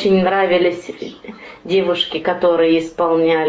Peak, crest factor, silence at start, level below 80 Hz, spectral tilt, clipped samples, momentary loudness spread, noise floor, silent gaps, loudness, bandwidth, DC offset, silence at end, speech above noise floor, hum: -4 dBFS; 12 dB; 0 s; -54 dBFS; -6 dB/octave; under 0.1%; 17 LU; -36 dBFS; none; -16 LUFS; 8 kHz; under 0.1%; 0 s; 20 dB; none